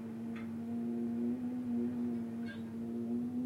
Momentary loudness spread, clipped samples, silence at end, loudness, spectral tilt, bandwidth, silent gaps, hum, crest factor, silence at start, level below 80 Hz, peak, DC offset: 6 LU; under 0.1%; 0 s; -39 LUFS; -8 dB/octave; 11 kHz; none; none; 10 dB; 0 s; -74 dBFS; -28 dBFS; under 0.1%